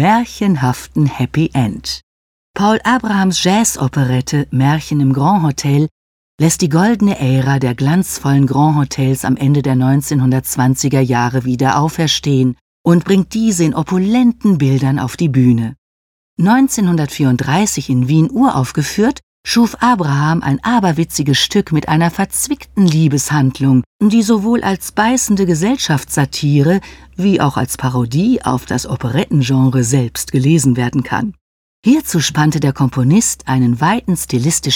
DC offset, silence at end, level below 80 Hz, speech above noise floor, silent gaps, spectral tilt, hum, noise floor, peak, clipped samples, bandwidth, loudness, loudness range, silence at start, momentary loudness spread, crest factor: under 0.1%; 0 s; -42 dBFS; over 77 dB; 2.03-2.54 s, 5.91-6.38 s, 12.61-12.84 s, 15.78-16.37 s, 19.23-19.44 s, 23.86-23.99 s, 31.41-31.83 s; -5.5 dB/octave; none; under -90 dBFS; 0 dBFS; under 0.1%; 17.5 kHz; -14 LUFS; 2 LU; 0 s; 5 LU; 12 dB